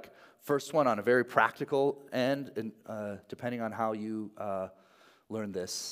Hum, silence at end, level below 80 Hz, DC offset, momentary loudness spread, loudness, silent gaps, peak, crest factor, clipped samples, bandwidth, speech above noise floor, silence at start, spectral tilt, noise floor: none; 0 s; -82 dBFS; under 0.1%; 13 LU; -32 LUFS; none; -8 dBFS; 24 dB; under 0.1%; 16 kHz; 30 dB; 0 s; -4.5 dB/octave; -62 dBFS